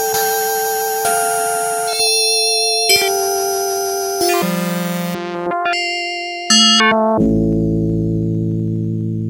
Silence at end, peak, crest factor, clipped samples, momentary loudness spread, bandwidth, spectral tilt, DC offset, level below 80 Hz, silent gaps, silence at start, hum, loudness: 0 s; -2 dBFS; 16 dB; under 0.1%; 9 LU; 16 kHz; -3 dB/octave; under 0.1%; -38 dBFS; none; 0 s; none; -15 LUFS